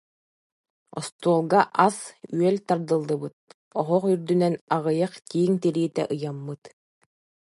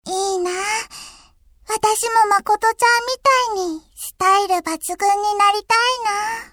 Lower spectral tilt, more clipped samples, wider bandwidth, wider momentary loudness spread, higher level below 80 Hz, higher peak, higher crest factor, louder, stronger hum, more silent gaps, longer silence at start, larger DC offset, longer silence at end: first, -6.5 dB/octave vs -0.5 dB/octave; neither; second, 11.5 kHz vs over 20 kHz; first, 14 LU vs 10 LU; second, -74 dBFS vs -54 dBFS; about the same, -2 dBFS vs -4 dBFS; first, 22 dB vs 16 dB; second, -24 LUFS vs -18 LUFS; neither; first, 1.12-1.19 s, 3.33-3.47 s, 3.54-3.71 s, 4.61-4.67 s vs none; first, 0.95 s vs 0.05 s; neither; first, 0.85 s vs 0.1 s